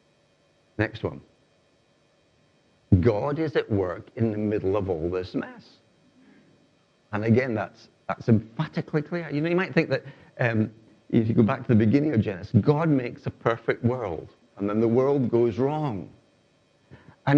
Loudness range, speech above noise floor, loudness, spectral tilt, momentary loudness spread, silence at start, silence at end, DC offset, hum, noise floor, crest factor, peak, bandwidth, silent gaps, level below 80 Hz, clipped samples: 6 LU; 39 dB; -25 LUFS; -9.5 dB/octave; 12 LU; 0.8 s; 0 s; under 0.1%; none; -64 dBFS; 22 dB; -4 dBFS; 7 kHz; none; -58 dBFS; under 0.1%